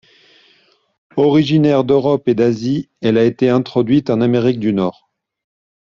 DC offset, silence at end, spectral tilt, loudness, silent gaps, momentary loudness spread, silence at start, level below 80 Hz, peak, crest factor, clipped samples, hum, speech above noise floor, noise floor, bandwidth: under 0.1%; 0.95 s; -8 dB/octave; -15 LUFS; none; 7 LU; 1.15 s; -54 dBFS; -2 dBFS; 14 dB; under 0.1%; none; 41 dB; -55 dBFS; 7.2 kHz